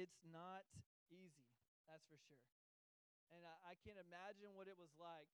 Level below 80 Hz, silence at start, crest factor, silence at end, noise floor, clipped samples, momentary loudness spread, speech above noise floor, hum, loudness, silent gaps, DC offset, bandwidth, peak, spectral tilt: -90 dBFS; 0 s; 20 dB; 0.05 s; under -90 dBFS; under 0.1%; 10 LU; over 27 dB; none; -62 LUFS; 0.86-1.06 s, 1.68-1.84 s, 2.52-3.27 s; under 0.1%; 10.5 kHz; -44 dBFS; -5 dB/octave